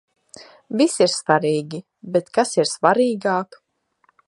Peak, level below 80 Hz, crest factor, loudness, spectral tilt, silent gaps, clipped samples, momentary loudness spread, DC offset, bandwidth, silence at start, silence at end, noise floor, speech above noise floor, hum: 0 dBFS; -72 dBFS; 20 dB; -20 LUFS; -4 dB/octave; none; under 0.1%; 12 LU; under 0.1%; 11.5 kHz; 0.4 s; 0.85 s; -64 dBFS; 45 dB; none